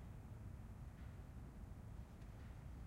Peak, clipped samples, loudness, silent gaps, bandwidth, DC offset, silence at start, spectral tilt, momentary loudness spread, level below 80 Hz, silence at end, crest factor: -42 dBFS; under 0.1%; -56 LUFS; none; 16 kHz; under 0.1%; 0 s; -7.5 dB/octave; 1 LU; -58 dBFS; 0 s; 12 dB